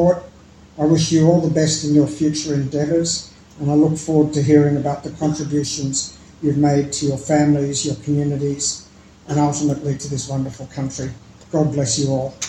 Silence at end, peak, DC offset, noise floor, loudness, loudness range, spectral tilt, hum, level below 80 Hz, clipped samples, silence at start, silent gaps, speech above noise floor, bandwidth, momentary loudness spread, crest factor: 0 s; 0 dBFS; under 0.1%; -44 dBFS; -19 LUFS; 4 LU; -5.5 dB/octave; none; -48 dBFS; under 0.1%; 0 s; none; 26 dB; 11 kHz; 11 LU; 18 dB